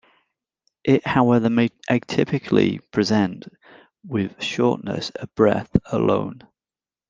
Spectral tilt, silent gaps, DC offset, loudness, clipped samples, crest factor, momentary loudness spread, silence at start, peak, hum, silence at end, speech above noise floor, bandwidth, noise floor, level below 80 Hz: -6.5 dB/octave; none; under 0.1%; -21 LUFS; under 0.1%; 20 dB; 11 LU; 0.85 s; -2 dBFS; none; 0.7 s; over 69 dB; 7.6 kHz; under -90 dBFS; -48 dBFS